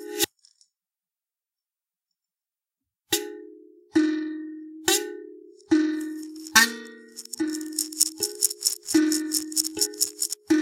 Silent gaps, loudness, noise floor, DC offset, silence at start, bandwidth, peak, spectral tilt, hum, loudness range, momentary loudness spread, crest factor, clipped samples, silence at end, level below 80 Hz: none; -24 LUFS; under -90 dBFS; under 0.1%; 0 s; 17 kHz; 0 dBFS; -0.5 dB/octave; none; 12 LU; 16 LU; 28 dB; under 0.1%; 0 s; -72 dBFS